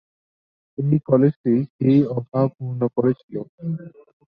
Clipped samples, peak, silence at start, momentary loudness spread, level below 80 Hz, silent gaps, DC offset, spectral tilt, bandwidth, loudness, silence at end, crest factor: under 0.1%; -2 dBFS; 0.8 s; 13 LU; -62 dBFS; 1.36-1.44 s, 1.70-1.79 s, 3.23-3.29 s, 3.49-3.58 s; under 0.1%; -12 dB/octave; 5 kHz; -21 LUFS; 0.45 s; 20 dB